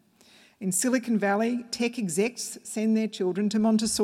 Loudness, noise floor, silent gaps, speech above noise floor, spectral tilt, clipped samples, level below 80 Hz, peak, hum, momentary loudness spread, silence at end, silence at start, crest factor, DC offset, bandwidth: -26 LUFS; -57 dBFS; none; 31 dB; -4 dB/octave; under 0.1%; -66 dBFS; -12 dBFS; none; 6 LU; 0 s; 0.6 s; 16 dB; under 0.1%; 15.5 kHz